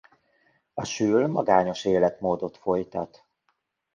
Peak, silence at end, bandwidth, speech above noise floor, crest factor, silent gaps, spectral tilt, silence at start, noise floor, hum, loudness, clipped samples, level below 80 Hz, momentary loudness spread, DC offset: -6 dBFS; 0.9 s; 9.4 kHz; 50 dB; 20 dB; none; -5.5 dB/octave; 0.75 s; -74 dBFS; none; -25 LUFS; under 0.1%; -60 dBFS; 13 LU; under 0.1%